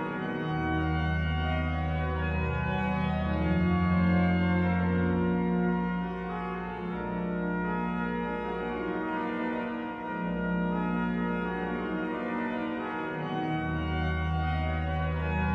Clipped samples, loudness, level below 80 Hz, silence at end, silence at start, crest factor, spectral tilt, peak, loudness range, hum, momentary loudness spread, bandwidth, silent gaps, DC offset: under 0.1%; -30 LUFS; -40 dBFS; 0 s; 0 s; 14 dB; -9 dB/octave; -16 dBFS; 5 LU; none; 7 LU; 5.4 kHz; none; under 0.1%